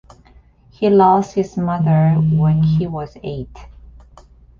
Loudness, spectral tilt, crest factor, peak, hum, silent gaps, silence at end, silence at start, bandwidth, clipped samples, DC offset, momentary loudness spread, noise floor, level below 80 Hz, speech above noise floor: -16 LUFS; -9.5 dB/octave; 14 dB; -2 dBFS; none; none; 0.95 s; 0.8 s; 7 kHz; under 0.1%; under 0.1%; 16 LU; -48 dBFS; -42 dBFS; 33 dB